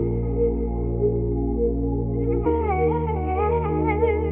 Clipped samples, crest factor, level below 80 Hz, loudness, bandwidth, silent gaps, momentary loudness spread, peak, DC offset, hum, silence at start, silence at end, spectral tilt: under 0.1%; 14 dB; -28 dBFS; -23 LUFS; 3.5 kHz; none; 3 LU; -8 dBFS; under 0.1%; none; 0 s; 0 s; -9.5 dB/octave